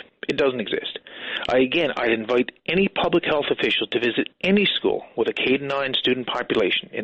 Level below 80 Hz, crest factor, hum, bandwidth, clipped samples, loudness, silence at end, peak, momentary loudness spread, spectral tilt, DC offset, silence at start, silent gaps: -56 dBFS; 14 dB; none; 8.2 kHz; under 0.1%; -22 LUFS; 0 s; -8 dBFS; 7 LU; -6 dB/octave; under 0.1%; 0.3 s; none